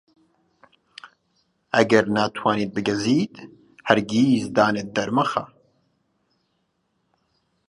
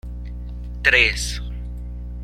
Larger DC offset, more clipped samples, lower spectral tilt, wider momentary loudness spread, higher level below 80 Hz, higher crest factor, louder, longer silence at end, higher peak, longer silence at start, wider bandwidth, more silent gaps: neither; neither; first, -5.5 dB/octave vs -2.5 dB/octave; second, 8 LU vs 19 LU; second, -62 dBFS vs -30 dBFS; about the same, 24 dB vs 22 dB; second, -21 LUFS vs -18 LUFS; first, 2.25 s vs 0 s; about the same, 0 dBFS vs 0 dBFS; first, 1.05 s vs 0.05 s; second, 11.5 kHz vs 14 kHz; neither